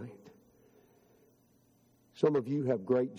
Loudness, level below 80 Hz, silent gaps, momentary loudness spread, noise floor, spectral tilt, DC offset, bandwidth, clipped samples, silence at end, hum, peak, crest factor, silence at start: -31 LUFS; -78 dBFS; none; 5 LU; -68 dBFS; -8.5 dB/octave; under 0.1%; 12.5 kHz; under 0.1%; 0 s; none; -14 dBFS; 22 dB; 0 s